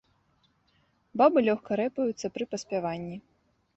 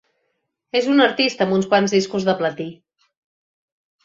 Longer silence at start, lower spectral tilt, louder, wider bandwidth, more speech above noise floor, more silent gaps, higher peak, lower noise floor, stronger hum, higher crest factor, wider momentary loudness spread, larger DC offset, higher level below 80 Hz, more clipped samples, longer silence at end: first, 1.15 s vs 0.75 s; about the same, -5.5 dB/octave vs -5 dB/octave; second, -28 LUFS vs -18 LUFS; about the same, 8.2 kHz vs 7.8 kHz; second, 42 dB vs 55 dB; neither; second, -8 dBFS vs -2 dBFS; second, -69 dBFS vs -73 dBFS; neither; about the same, 20 dB vs 18 dB; first, 16 LU vs 9 LU; neither; about the same, -68 dBFS vs -64 dBFS; neither; second, 0.55 s vs 1.3 s